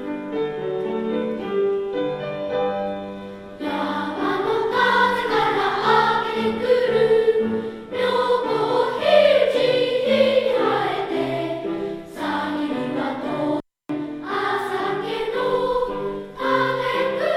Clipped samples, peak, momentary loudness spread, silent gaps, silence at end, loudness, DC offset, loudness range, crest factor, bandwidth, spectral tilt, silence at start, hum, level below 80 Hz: under 0.1%; -4 dBFS; 11 LU; none; 0 s; -21 LUFS; under 0.1%; 7 LU; 18 dB; 14 kHz; -5.5 dB/octave; 0 s; none; -54 dBFS